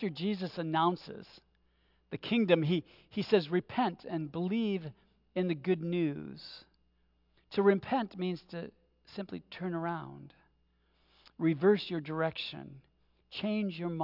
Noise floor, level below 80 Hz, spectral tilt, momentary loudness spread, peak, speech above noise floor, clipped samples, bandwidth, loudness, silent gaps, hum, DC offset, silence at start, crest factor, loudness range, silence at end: -72 dBFS; -72 dBFS; -8.5 dB/octave; 19 LU; -12 dBFS; 39 dB; under 0.1%; 5.8 kHz; -33 LUFS; none; none; under 0.1%; 0 s; 22 dB; 4 LU; 0 s